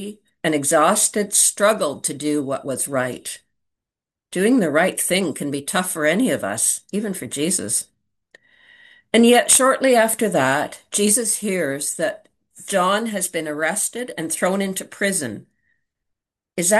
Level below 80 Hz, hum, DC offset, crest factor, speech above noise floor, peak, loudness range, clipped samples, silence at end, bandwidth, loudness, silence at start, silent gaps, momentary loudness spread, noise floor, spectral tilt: -68 dBFS; none; under 0.1%; 20 dB; 68 dB; 0 dBFS; 6 LU; under 0.1%; 0 s; 13 kHz; -19 LUFS; 0 s; none; 11 LU; -88 dBFS; -3 dB/octave